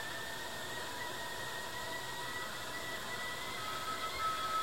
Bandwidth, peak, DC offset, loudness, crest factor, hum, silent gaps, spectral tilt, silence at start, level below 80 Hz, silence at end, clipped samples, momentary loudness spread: 16.5 kHz; -26 dBFS; 0.3%; -40 LUFS; 14 dB; none; none; -2 dB/octave; 0 s; -64 dBFS; 0 s; under 0.1%; 5 LU